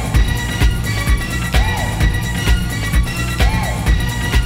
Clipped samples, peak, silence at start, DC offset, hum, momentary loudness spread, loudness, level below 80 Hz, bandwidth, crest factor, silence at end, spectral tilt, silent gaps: under 0.1%; -2 dBFS; 0 s; under 0.1%; none; 2 LU; -17 LUFS; -18 dBFS; 16.5 kHz; 14 dB; 0 s; -4.5 dB/octave; none